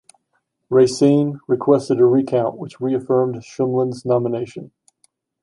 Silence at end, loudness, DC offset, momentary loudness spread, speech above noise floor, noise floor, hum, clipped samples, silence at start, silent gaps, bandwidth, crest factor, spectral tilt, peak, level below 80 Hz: 0.75 s; -18 LUFS; under 0.1%; 10 LU; 53 dB; -70 dBFS; none; under 0.1%; 0.7 s; none; 11 kHz; 16 dB; -7.5 dB/octave; -2 dBFS; -64 dBFS